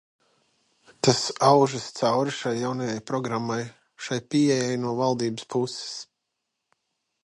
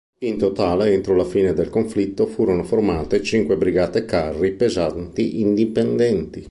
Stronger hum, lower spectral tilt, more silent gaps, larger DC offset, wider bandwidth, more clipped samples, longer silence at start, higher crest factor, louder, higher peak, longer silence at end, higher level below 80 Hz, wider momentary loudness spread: neither; second, -5 dB/octave vs -7 dB/octave; neither; neither; about the same, 11.5 kHz vs 11.5 kHz; neither; first, 1.05 s vs 0.2 s; first, 22 dB vs 14 dB; second, -25 LUFS vs -20 LUFS; about the same, -4 dBFS vs -4 dBFS; first, 1.2 s vs 0 s; second, -68 dBFS vs -42 dBFS; first, 12 LU vs 4 LU